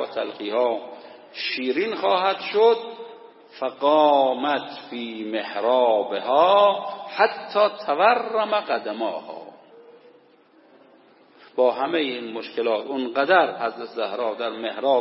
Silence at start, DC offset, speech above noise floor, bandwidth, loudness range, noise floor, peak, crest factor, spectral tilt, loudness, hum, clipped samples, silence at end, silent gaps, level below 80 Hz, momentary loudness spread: 0 s; under 0.1%; 33 dB; 5.8 kHz; 8 LU; -55 dBFS; -4 dBFS; 20 dB; -7.5 dB/octave; -22 LUFS; none; under 0.1%; 0 s; none; -88 dBFS; 14 LU